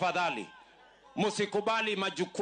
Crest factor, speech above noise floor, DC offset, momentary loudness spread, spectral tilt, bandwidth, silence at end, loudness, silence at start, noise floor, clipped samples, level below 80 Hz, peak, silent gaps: 14 dB; 27 dB; under 0.1%; 11 LU; -4 dB/octave; 9.6 kHz; 0 s; -31 LUFS; 0 s; -58 dBFS; under 0.1%; -76 dBFS; -18 dBFS; none